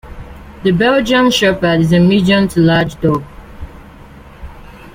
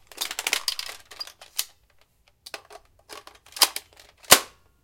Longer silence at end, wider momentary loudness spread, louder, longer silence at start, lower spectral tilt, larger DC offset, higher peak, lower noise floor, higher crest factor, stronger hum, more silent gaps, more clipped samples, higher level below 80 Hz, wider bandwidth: second, 0.05 s vs 0.4 s; about the same, 24 LU vs 26 LU; first, -12 LUFS vs -22 LUFS; about the same, 0.05 s vs 0.15 s; first, -6 dB/octave vs 0.5 dB/octave; neither; about the same, 0 dBFS vs 0 dBFS; second, -37 dBFS vs -62 dBFS; second, 14 dB vs 28 dB; neither; neither; neither; first, -36 dBFS vs -64 dBFS; about the same, 16 kHz vs 17 kHz